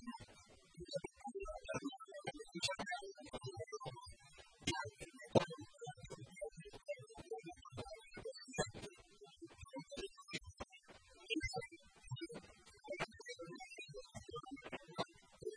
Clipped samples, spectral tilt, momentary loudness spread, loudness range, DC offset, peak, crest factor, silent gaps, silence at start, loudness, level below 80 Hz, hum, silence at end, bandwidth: under 0.1%; -4 dB/octave; 16 LU; 6 LU; under 0.1%; -18 dBFS; 30 dB; none; 0 s; -47 LUFS; -66 dBFS; none; 0 s; 10.5 kHz